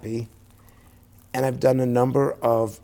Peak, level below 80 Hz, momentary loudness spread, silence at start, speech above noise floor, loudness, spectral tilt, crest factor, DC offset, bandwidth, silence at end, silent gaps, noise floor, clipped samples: -8 dBFS; -56 dBFS; 12 LU; 0.05 s; 30 dB; -23 LUFS; -7.5 dB/octave; 16 dB; under 0.1%; 17.5 kHz; 0.05 s; none; -52 dBFS; under 0.1%